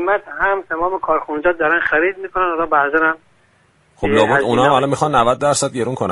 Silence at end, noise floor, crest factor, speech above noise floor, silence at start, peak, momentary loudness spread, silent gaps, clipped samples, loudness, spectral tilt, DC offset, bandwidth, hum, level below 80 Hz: 0 s; -56 dBFS; 16 dB; 39 dB; 0 s; 0 dBFS; 6 LU; none; under 0.1%; -16 LUFS; -4.5 dB/octave; under 0.1%; 11.5 kHz; none; -44 dBFS